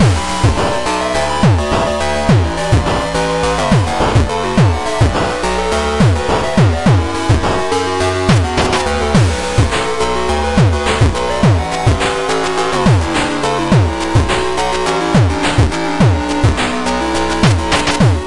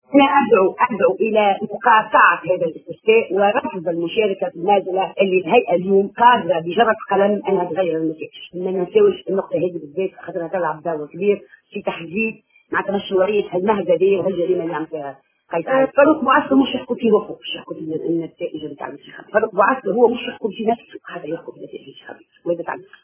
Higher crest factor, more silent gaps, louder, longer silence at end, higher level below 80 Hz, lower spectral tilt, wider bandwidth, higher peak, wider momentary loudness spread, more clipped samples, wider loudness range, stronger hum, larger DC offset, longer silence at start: second, 12 dB vs 18 dB; neither; first, -14 LUFS vs -18 LUFS; second, 0 s vs 0.2 s; first, -26 dBFS vs -62 dBFS; second, -5.5 dB/octave vs -9.5 dB/octave; first, 11.5 kHz vs 3.5 kHz; about the same, 0 dBFS vs 0 dBFS; second, 3 LU vs 15 LU; neither; second, 1 LU vs 5 LU; neither; neither; about the same, 0 s vs 0.1 s